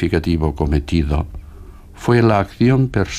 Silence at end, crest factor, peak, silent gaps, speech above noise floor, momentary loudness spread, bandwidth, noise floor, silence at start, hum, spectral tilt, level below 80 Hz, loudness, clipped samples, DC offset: 0 s; 16 dB; -2 dBFS; none; 21 dB; 10 LU; 14 kHz; -37 dBFS; 0 s; none; -7.5 dB/octave; -26 dBFS; -17 LUFS; under 0.1%; under 0.1%